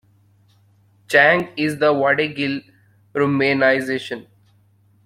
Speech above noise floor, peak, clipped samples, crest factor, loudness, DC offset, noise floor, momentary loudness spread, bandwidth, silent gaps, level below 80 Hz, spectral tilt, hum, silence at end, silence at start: 39 dB; -2 dBFS; under 0.1%; 18 dB; -18 LUFS; under 0.1%; -56 dBFS; 15 LU; 15 kHz; none; -62 dBFS; -5.5 dB/octave; none; 0.85 s; 1.1 s